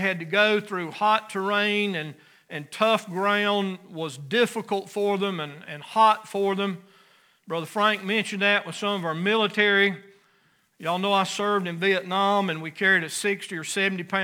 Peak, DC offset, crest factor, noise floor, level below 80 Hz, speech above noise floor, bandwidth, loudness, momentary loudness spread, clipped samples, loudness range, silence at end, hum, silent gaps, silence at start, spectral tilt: -6 dBFS; under 0.1%; 20 dB; -64 dBFS; -84 dBFS; 40 dB; 18.5 kHz; -24 LUFS; 13 LU; under 0.1%; 2 LU; 0 s; none; none; 0 s; -4 dB/octave